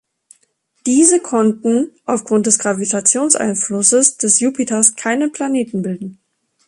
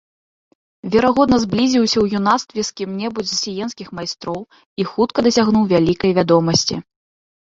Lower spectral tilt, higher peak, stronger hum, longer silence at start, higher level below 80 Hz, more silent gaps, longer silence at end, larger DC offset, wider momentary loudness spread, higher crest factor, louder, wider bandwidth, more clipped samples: second, -3.5 dB/octave vs -5 dB/octave; about the same, 0 dBFS vs -2 dBFS; neither; about the same, 0.85 s vs 0.85 s; second, -62 dBFS vs -48 dBFS; second, none vs 4.66-4.76 s; second, 0.55 s vs 0.75 s; neither; second, 10 LU vs 13 LU; about the same, 16 dB vs 16 dB; first, -14 LUFS vs -17 LUFS; first, 11.5 kHz vs 7.8 kHz; neither